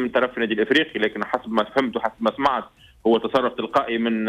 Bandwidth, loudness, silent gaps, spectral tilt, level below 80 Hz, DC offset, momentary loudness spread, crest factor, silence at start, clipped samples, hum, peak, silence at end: 12 kHz; -22 LUFS; none; -5.5 dB/octave; -58 dBFS; under 0.1%; 5 LU; 14 dB; 0 s; under 0.1%; none; -8 dBFS; 0 s